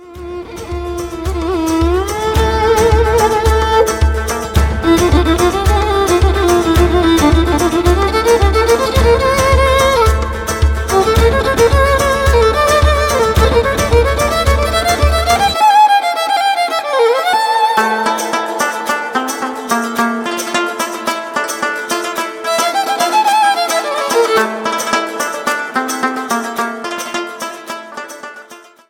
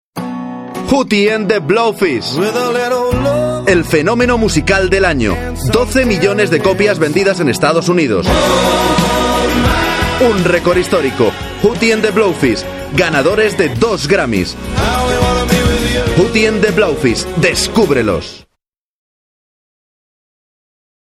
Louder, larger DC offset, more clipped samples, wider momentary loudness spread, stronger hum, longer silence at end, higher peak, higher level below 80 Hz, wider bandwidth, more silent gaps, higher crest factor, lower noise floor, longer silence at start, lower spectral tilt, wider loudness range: about the same, -13 LUFS vs -12 LUFS; neither; neither; first, 9 LU vs 4 LU; neither; second, 0.3 s vs 2.65 s; about the same, 0 dBFS vs 0 dBFS; first, -22 dBFS vs -28 dBFS; about the same, 17.5 kHz vs 16 kHz; neither; about the same, 12 dB vs 12 dB; second, -38 dBFS vs -72 dBFS; second, 0 s vs 0.15 s; about the same, -4.5 dB/octave vs -5 dB/octave; first, 6 LU vs 2 LU